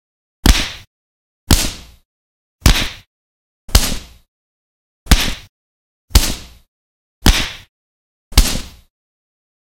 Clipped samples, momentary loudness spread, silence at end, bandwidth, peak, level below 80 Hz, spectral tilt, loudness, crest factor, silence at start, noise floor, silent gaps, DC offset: 0.3%; 18 LU; 1.05 s; 17 kHz; 0 dBFS; -20 dBFS; -3 dB/octave; -16 LUFS; 18 dB; 0.45 s; under -90 dBFS; 0.87-1.47 s, 2.05-2.59 s, 3.07-3.68 s, 4.28-5.06 s, 5.49-6.08 s, 6.68-7.21 s, 7.69-8.31 s; 0.8%